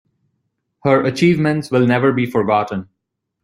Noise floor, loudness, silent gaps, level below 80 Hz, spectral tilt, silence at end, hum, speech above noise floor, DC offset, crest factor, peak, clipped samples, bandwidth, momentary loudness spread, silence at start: -71 dBFS; -16 LUFS; none; -56 dBFS; -7 dB/octave; 0.6 s; none; 56 dB; under 0.1%; 16 dB; -2 dBFS; under 0.1%; 13 kHz; 8 LU; 0.85 s